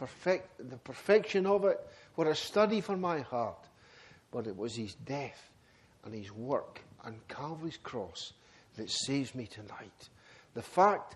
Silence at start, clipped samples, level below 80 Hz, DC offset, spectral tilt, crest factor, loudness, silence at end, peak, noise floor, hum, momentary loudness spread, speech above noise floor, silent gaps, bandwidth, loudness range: 0 s; under 0.1%; -72 dBFS; under 0.1%; -4.5 dB/octave; 22 dB; -33 LUFS; 0 s; -12 dBFS; -64 dBFS; none; 20 LU; 30 dB; none; 12.5 kHz; 11 LU